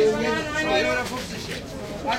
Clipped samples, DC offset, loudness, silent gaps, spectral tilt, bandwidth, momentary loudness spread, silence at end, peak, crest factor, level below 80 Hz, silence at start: under 0.1%; under 0.1%; -25 LUFS; none; -4 dB/octave; 16 kHz; 11 LU; 0 s; -10 dBFS; 14 dB; -46 dBFS; 0 s